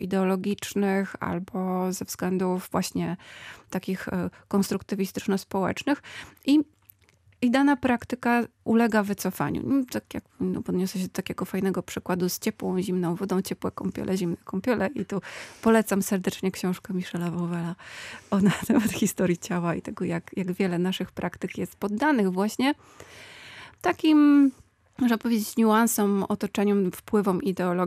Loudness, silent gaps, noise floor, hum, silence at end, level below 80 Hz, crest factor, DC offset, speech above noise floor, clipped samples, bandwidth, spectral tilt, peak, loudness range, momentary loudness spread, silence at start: -26 LUFS; none; -61 dBFS; none; 0 s; -62 dBFS; 18 dB; under 0.1%; 35 dB; under 0.1%; 15.5 kHz; -5.5 dB/octave; -8 dBFS; 6 LU; 10 LU; 0 s